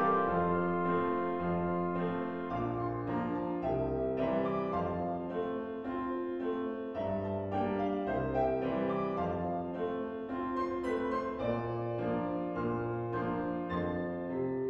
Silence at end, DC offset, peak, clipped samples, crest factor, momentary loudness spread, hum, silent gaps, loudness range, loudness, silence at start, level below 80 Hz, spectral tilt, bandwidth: 0 s; under 0.1%; -18 dBFS; under 0.1%; 16 dB; 5 LU; none; none; 1 LU; -34 LUFS; 0 s; -56 dBFS; -9.5 dB/octave; 7 kHz